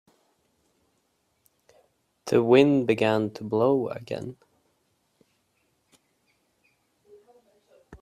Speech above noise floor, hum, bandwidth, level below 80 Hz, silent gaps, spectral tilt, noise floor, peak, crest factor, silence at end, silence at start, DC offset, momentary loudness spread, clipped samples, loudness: 49 dB; none; 13.5 kHz; -68 dBFS; none; -7 dB/octave; -72 dBFS; -4 dBFS; 24 dB; 0.05 s; 2.25 s; under 0.1%; 17 LU; under 0.1%; -23 LUFS